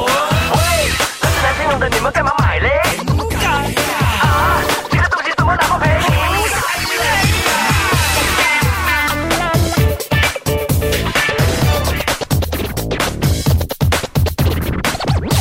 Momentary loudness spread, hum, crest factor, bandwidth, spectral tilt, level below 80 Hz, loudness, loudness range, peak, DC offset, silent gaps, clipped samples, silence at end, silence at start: 4 LU; none; 12 dB; 16.5 kHz; -4 dB/octave; -24 dBFS; -15 LUFS; 3 LU; -2 dBFS; under 0.1%; none; under 0.1%; 0 s; 0 s